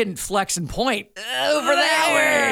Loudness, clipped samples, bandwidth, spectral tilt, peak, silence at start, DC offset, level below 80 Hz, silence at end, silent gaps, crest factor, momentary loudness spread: -20 LUFS; under 0.1%; 17.5 kHz; -2.5 dB/octave; -4 dBFS; 0 s; under 0.1%; -46 dBFS; 0 s; none; 16 dB; 8 LU